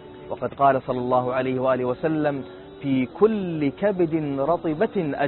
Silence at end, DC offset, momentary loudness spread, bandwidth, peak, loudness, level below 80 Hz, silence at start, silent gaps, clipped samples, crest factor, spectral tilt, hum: 0 s; under 0.1%; 11 LU; 4.3 kHz; -6 dBFS; -23 LUFS; -56 dBFS; 0 s; none; under 0.1%; 18 dB; -12 dB/octave; none